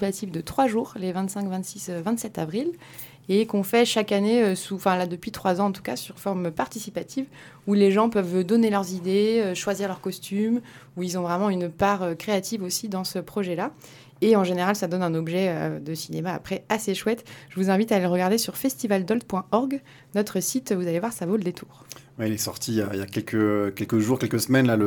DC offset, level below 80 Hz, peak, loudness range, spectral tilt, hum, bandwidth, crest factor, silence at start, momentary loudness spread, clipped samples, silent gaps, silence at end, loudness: under 0.1%; -62 dBFS; -6 dBFS; 4 LU; -5 dB/octave; none; 19 kHz; 18 dB; 0 s; 11 LU; under 0.1%; none; 0 s; -25 LUFS